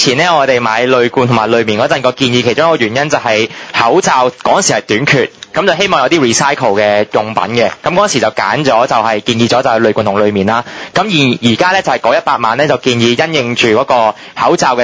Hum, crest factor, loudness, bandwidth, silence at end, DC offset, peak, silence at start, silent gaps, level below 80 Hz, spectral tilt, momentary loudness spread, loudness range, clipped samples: none; 10 dB; -11 LUFS; 8 kHz; 0 s; under 0.1%; 0 dBFS; 0 s; none; -48 dBFS; -4 dB/octave; 4 LU; 1 LU; 0.2%